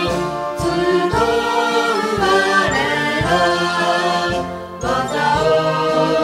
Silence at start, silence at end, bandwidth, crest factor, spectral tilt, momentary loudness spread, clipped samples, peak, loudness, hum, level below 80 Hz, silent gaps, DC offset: 0 s; 0 s; 15.5 kHz; 14 dB; -4.5 dB/octave; 6 LU; under 0.1%; -4 dBFS; -17 LUFS; none; -40 dBFS; none; under 0.1%